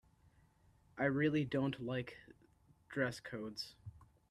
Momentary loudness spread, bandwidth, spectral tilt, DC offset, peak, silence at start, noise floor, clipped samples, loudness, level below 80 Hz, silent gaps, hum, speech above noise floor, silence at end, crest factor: 22 LU; 13 kHz; -6.5 dB/octave; under 0.1%; -22 dBFS; 0.95 s; -70 dBFS; under 0.1%; -39 LUFS; -70 dBFS; none; none; 31 dB; 0.25 s; 20 dB